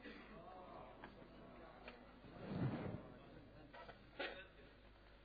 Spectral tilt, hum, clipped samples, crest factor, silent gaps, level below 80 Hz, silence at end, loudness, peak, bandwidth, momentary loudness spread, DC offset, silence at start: -5.5 dB/octave; none; under 0.1%; 20 dB; none; -68 dBFS; 0 s; -53 LUFS; -32 dBFS; 5 kHz; 16 LU; under 0.1%; 0 s